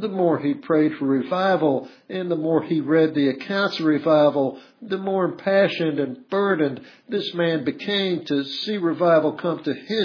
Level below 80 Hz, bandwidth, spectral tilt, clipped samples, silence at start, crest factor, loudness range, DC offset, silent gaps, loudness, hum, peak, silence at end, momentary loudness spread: -76 dBFS; 5.4 kHz; -7.5 dB/octave; under 0.1%; 0 s; 16 dB; 3 LU; under 0.1%; none; -22 LUFS; none; -6 dBFS; 0 s; 9 LU